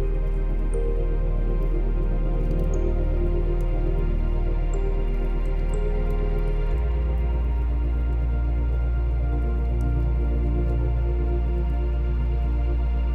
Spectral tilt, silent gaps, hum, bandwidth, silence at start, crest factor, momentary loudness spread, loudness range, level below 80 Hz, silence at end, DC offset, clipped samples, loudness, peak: -9 dB/octave; none; none; 3.7 kHz; 0 s; 10 dB; 3 LU; 2 LU; -22 dBFS; 0 s; under 0.1%; under 0.1%; -26 LUFS; -12 dBFS